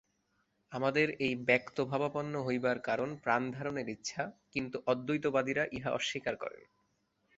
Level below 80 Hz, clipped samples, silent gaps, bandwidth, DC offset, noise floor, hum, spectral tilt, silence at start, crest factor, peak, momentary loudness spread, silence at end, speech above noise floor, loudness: -70 dBFS; under 0.1%; none; 8 kHz; under 0.1%; -77 dBFS; none; -4 dB/octave; 0.7 s; 24 dB; -12 dBFS; 8 LU; 0.8 s; 43 dB; -34 LUFS